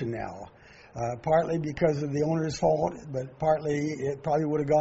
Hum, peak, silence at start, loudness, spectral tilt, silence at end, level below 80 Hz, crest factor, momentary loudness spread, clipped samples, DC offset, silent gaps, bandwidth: none; -10 dBFS; 0 s; -28 LUFS; -7 dB/octave; 0 s; -54 dBFS; 16 dB; 11 LU; under 0.1%; under 0.1%; none; 8 kHz